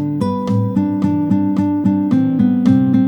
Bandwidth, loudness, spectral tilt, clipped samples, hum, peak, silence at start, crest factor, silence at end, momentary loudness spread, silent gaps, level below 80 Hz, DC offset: 17.5 kHz; -16 LUFS; -9.5 dB/octave; under 0.1%; none; -2 dBFS; 0 s; 14 dB; 0 s; 5 LU; none; -50 dBFS; under 0.1%